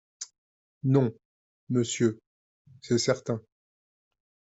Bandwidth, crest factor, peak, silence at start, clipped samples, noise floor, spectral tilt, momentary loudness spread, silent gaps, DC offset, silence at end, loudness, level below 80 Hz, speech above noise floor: 8.2 kHz; 20 dB; -10 dBFS; 0.2 s; under 0.1%; under -90 dBFS; -5.5 dB/octave; 17 LU; 0.38-0.81 s, 1.25-1.67 s, 2.27-2.65 s; under 0.1%; 1.1 s; -28 LUFS; -70 dBFS; over 64 dB